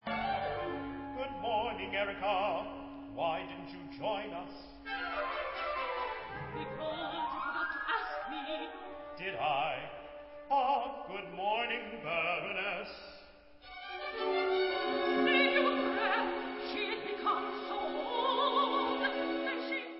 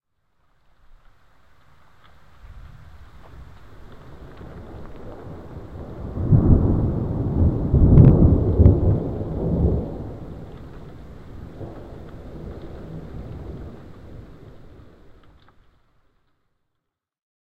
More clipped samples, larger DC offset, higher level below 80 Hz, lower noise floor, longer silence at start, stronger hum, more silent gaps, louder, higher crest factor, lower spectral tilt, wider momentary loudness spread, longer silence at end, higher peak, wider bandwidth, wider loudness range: neither; second, under 0.1% vs 0.5%; second, -64 dBFS vs -28 dBFS; second, -56 dBFS vs -79 dBFS; second, 0.05 s vs 2.5 s; neither; neither; second, -34 LUFS vs -18 LUFS; about the same, 18 dB vs 22 dB; second, -1 dB/octave vs -12 dB/octave; second, 14 LU vs 26 LU; second, 0 s vs 3.3 s; second, -16 dBFS vs 0 dBFS; first, 5.6 kHz vs 4.2 kHz; second, 7 LU vs 24 LU